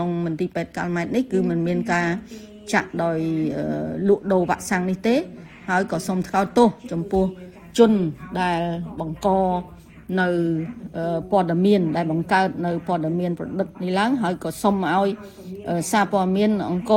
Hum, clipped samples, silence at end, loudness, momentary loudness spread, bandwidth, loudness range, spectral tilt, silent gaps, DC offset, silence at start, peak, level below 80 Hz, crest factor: none; under 0.1%; 0 s; -22 LUFS; 10 LU; 17 kHz; 2 LU; -6.5 dB/octave; none; under 0.1%; 0 s; -2 dBFS; -50 dBFS; 18 dB